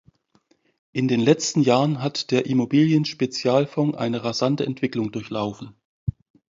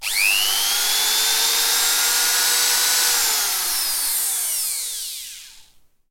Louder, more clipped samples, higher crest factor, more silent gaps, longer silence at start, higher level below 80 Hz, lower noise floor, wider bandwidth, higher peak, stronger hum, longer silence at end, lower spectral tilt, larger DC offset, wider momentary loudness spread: second, -22 LUFS vs -17 LUFS; neither; about the same, 18 dB vs 16 dB; first, 5.85-6.07 s vs none; first, 0.95 s vs 0 s; about the same, -54 dBFS vs -56 dBFS; first, -64 dBFS vs -52 dBFS; second, 7.8 kHz vs 17 kHz; about the same, -4 dBFS vs -6 dBFS; neither; about the same, 0.45 s vs 0.5 s; first, -5.5 dB/octave vs 3.5 dB/octave; neither; first, 13 LU vs 8 LU